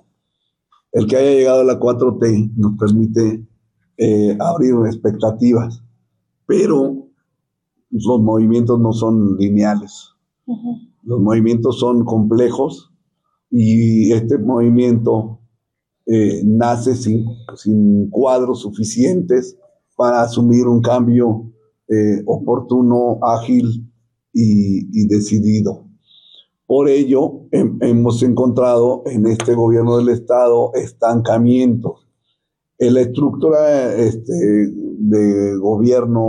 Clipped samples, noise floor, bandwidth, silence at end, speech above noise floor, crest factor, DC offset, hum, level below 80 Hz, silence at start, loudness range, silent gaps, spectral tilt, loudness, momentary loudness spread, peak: under 0.1%; -75 dBFS; 10.5 kHz; 0 s; 62 dB; 10 dB; under 0.1%; none; -52 dBFS; 0.95 s; 3 LU; none; -8 dB/octave; -15 LUFS; 9 LU; -4 dBFS